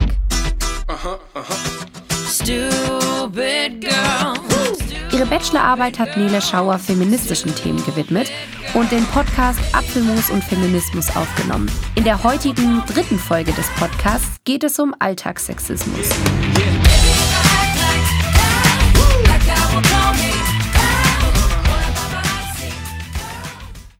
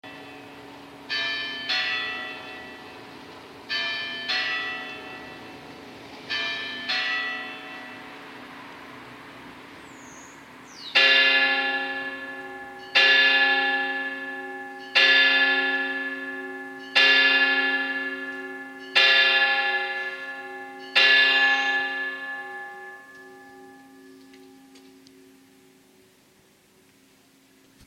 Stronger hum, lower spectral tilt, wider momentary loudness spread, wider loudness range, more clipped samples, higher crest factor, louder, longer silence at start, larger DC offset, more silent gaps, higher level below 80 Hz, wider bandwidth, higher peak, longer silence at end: neither; first, -4 dB/octave vs -1 dB/octave; second, 11 LU vs 26 LU; second, 5 LU vs 12 LU; neither; second, 16 dB vs 22 dB; first, -17 LUFS vs -21 LUFS; about the same, 0 s vs 0.05 s; neither; neither; first, -22 dBFS vs -72 dBFS; first, 18.5 kHz vs 16 kHz; first, 0 dBFS vs -4 dBFS; second, 0.1 s vs 3.1 s